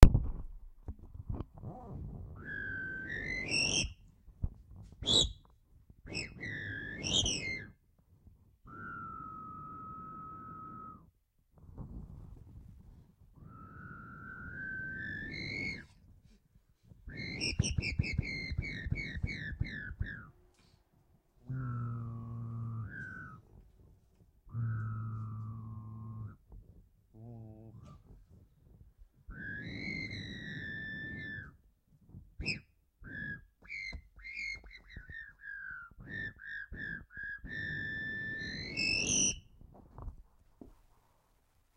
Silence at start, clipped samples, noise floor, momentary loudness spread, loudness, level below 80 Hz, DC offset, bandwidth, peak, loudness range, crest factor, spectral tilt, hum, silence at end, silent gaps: 0 s; under 0.1%; -71 dBFS; 23 LU; -38 LUFS; -42 dBFS; under 0.1%; 16 kHz; -2 dBFS; 15 LU; 36 dB; -3 dB/octave; none; 1 s; none